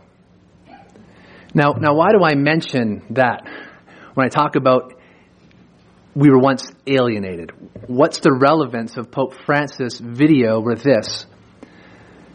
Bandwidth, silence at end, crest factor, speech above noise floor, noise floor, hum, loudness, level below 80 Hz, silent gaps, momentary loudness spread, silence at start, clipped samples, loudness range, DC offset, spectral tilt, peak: 10 kHz; 1.1 s; 18 dB; 35 dB; -51 dBFS; none; -17 LUFS; -58 dBFS; none; 14 LU; 1.55 s; under 0.1%; 3 LU; under 0.1%; -6.5 dB/octave; 0 dBFS